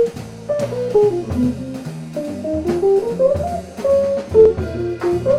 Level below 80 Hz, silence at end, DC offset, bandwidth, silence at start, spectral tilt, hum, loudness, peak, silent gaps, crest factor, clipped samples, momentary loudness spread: -40 dBFS; 0 s; under 0.1%; 13.5 kHz; 0 s; -7.5 dB/octave; none; -18 LUFS; -2 dBFS; none; 16 dB; under 0.1%; 14 LU